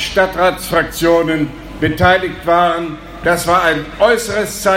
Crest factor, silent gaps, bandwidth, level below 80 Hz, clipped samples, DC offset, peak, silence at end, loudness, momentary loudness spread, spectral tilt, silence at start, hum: 14 dB; none; 16.5 kHz; -34 dBFS; under 0.1%; under 0.1%; 0 dBFS; 0 s; -14 LUFS; 7 LU; -4.5 dB/octave; 0 s; none